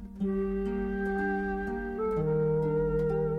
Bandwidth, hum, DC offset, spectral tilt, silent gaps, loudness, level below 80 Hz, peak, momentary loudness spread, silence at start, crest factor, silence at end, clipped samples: 5.4 kHz; none; under 0.1%; -10 dB/octave; none; -30 LUFS; -44 dBFS; -18 dBFS; 5 LU; 0 s; 12 dB; 0 s; under 0.1%